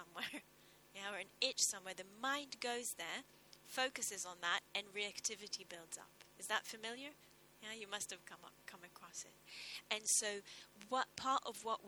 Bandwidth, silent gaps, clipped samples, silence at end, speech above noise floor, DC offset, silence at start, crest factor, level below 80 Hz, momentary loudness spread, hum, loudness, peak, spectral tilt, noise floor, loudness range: over 20 kHz; none; under 0.1%; 0 s; 23 dB; under 0.1%; 0 s; 26 dB; -84 dBFS; 19 LU; none; -42 LUFS; -18 dBFS; 0.5 dB/octave; -67 dBFS; 6 LU